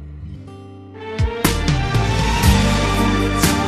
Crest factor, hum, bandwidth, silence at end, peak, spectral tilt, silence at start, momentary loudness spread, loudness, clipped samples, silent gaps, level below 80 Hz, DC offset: 16 dB; none; 14 kHz; 0 s; -2 dBFS; -5 dB/octave; 0 s; 20 LU; -17 LUFS; under 0.1%; none; -24 dBFS; under 0.1%